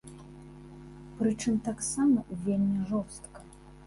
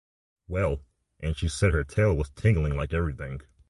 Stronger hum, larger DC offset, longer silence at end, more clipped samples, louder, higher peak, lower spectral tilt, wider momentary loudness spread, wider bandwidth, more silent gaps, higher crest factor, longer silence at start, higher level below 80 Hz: neither; neither; second, 0 s vs 0.3 s; neither; about the same, -29 LUFS vs -27 LUFS; second, -16 dBFS vs -10 dBFS; about the same, -6 dB/octave vs -6.5 dB/octave; first, 22 LU vs 11 LU; about the same, 11.5 kHz vs 11.5 kHz; neither; about the same, 16 dB vs 18 dB; second, 0.05 s vs 0.5 s; second, -56 dBFS vs -34 dBFS